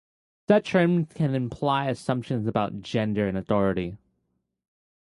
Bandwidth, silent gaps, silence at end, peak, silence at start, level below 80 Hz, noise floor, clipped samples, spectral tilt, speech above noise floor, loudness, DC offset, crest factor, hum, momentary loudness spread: 11.5 kHz; none; 1.15 s; -6 dBFS; 0.5 s; -54 dBFS; -76 dBFS; under 0.1%; -7.5 dB/octave; 52 dB; -25 LUFS; under 0.1%; 20 dB; none; 7 LU